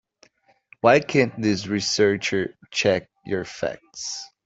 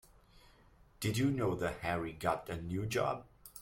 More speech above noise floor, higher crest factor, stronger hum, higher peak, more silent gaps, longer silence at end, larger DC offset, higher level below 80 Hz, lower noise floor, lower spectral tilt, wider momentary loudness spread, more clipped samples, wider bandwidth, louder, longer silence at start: first, 36 dB vs 28 dB; about the same, 20 dB vs 20 dB; neither; first, -2 dBFS vs -18 dBFS; neither; first, 0.2 s vs 0 s; neither; about the same, -62 dBFS vs -58 dBFS; second, -59 dBFS vs -63 dBFS; second, -4 dB/octave vs -5.5 dB/octave; first, 12 LU vs 7 LU; neither; second, 8 kHz vs 16.5 kHz; first, -23 LUFS vs -36 LUFS; first, 0.85 s vs 0.35 s